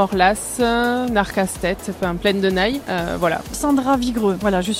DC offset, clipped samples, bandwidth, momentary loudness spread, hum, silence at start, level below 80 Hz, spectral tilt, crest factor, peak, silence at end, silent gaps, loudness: under 0.1%; under 0.1%; 16.5 kHz; 6 LU; none; 0 s; -38 dBFS; -4.5 dB/octave; 16 dB; -2 dBFS; 0 s; none; -19 LUFS